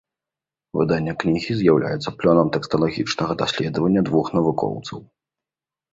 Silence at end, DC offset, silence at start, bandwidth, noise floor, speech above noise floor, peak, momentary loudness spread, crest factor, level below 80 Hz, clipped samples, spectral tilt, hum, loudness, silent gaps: 0.9 s; under 0.1%; 0.75 s; 7.8 kHz; -90 dBFS; 70 dB; -2 dBFS; 8 LU; 20 dB; -52 dBFS; under 0.1%; -6.5 dB/octave; none; -21 LUFS; none